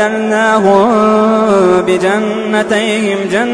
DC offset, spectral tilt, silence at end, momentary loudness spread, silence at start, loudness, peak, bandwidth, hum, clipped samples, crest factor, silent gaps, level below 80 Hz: under 0.1%; -5 dB/octave; 0 s; 5 LU; 0 s; -11 LUFS; 0 dBFS; 10.5 kHz; none; under 0.1%; 10 dB; none; -48 dBFS